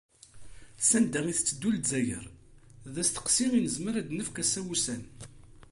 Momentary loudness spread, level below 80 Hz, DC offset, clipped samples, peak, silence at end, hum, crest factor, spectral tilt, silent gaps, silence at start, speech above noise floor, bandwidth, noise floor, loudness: 14 LU; -58 dBFS; under 0.1%; under 0.1%; -12 dBFS; 0 s; none; 20 dB; -3 dB/octave; none; 0.35 s; 24 dB; 11.5 kHz; -53 dBFS; -28 LUFS